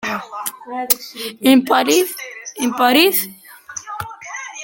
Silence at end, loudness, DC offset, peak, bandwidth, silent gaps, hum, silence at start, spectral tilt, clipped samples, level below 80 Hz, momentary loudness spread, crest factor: 0 s; -16 LUFS; under 0.1%; 0 dBFS; 17 kHz; none; none; 0 s; -2 dB/octave; under 0.1%; -60 dBFS; 17 LU; 18 dB